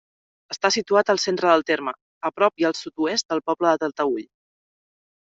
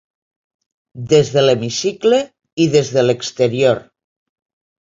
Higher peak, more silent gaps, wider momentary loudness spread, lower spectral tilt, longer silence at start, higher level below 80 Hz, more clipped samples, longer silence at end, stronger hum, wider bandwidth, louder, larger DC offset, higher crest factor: about the same, -4 dBFS vs -2 dBFS; first, 2.01-2.21 s, 3.25-3.29 s vs 2.53-2.57 s; first, 11 LU vs 6 LU; second, -3 dB/octave vs -5 dB/octave; second, 0.5 s vs 0.95 s; second, -70 dBFS vs -56 dBFS; neither; about the same, 1.15 s vs 1.05 s; neither; about the same, 8 kHz vs 7.8 kHz; second, -22 LUFS vs -15 LUFS; neither; about the same, 20 dB vs 16 dB